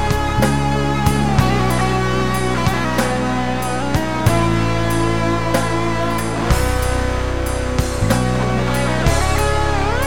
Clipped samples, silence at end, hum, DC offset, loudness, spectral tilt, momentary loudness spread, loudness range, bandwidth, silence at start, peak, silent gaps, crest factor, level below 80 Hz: under 0.1%; 0 s; none; 4%; -18 LUFS; -5.5 dB/octave; 4 LU; 2 LU; 18 kHz; 0 s; -2 dBFS; none; 16 dB; -26 dBFS